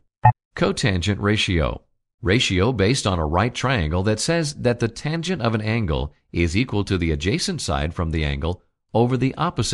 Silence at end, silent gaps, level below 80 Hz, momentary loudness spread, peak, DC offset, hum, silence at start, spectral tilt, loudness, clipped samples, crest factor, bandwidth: 0 s; 0.45-0.51 s, 2.14-2.18 s; -34 dBFS; 6 LU; 0 dBFS; under 0.1%; none; 0.25 s; -5 dB/octave; -22 LUFS; under 0.1%; 20 dB; 12 kHz